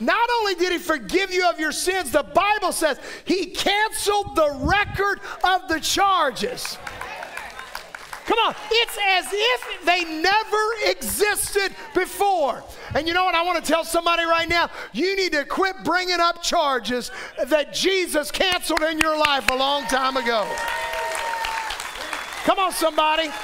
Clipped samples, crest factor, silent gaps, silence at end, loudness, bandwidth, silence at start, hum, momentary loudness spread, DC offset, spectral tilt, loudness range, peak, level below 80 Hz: under 0.1%; 18 dB; none; 0 s; -21 LUFS; 16 kHz; 0 s; none; 10 LU; under 0.1%; -2 dB/octave; 3 LU; -4 dBFS; -46 dBFS